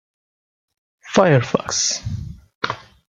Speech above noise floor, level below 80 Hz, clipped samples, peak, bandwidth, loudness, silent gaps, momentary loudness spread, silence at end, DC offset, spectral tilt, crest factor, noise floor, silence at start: over 72 dB; -46 dBFS; under 0.1%; 0 dBFS; 10 kHz; -19 LUFS; 2.55-2.61 s; 17 LU; 0.35 s; under 0.1%; -4 dB/octave; 22 dB; under -90 dBFS; 1.05 s